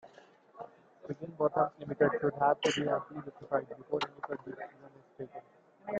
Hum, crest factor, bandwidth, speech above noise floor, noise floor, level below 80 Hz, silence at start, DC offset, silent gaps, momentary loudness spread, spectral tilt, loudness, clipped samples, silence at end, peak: none; 22 dB; 9.2 kHz; 26 dB; -60 dBFS; -74 dBFS; 0.05 s; under 0.1%; none; 21 LU; -5 dB/octave; -33 LUFS; under 0.1%; 0 s; -14 dBFS